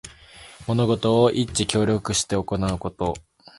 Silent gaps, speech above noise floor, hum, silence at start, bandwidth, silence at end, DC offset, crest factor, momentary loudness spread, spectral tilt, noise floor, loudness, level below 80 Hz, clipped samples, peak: none; 24 dB; none; 0.05 s; 11.5 kHz; 0.4 s; under 0.1%; 20 dB; 10 LU; -5 dB/octave; -46 dBFS; -22 LUFS; -44 dBFS; under 0.1%; -4 dBFS